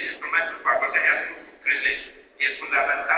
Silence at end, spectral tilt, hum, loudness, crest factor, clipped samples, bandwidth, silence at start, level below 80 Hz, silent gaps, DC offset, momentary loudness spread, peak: 0 s; 2.5 dB/octave; none; -23 LUFS; 18 dB; under 0.1%; 4 kHz; 0 s; -62 dBFS; none; under 0.1%; 9 LU; -8 dBFS